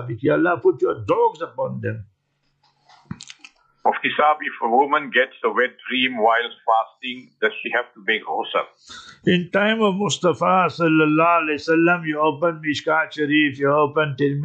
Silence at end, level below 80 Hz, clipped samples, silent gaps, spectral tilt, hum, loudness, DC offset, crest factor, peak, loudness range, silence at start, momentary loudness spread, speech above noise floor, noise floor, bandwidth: 0 s; -66 dBFS; under 0.1%; none; -5.5 dB/octave; none; -20 LUFS; under 0.1%; 16 dB; -4 dBFS; 6 LU; 0 s; 11 LU; 49 dB; -69 dBFS; 9 kHz